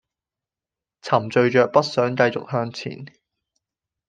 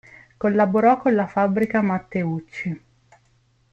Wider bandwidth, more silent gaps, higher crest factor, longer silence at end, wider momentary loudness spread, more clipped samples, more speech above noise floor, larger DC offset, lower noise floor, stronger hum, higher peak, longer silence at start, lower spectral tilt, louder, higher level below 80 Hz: first, 9.2 kHz vs 7.4 kHz; neither; first, 22 dB vs 16 dB; about the same, 1 s vs 0.95 s; first, 16 LU vs 13 LU; neither; first, 69 dB vs 41 dB; neither; first, -89 dBFS vs -62 dBFS; neither; first, -2 dBFS vs -6 dBFS; first, 1.05 s vs 0.4 s; second, -6 dB/octave vs -9 dB/octave; about the same, -20 LUFS vs -21 LUFS; second, -66 dBFS vs -60 dBFS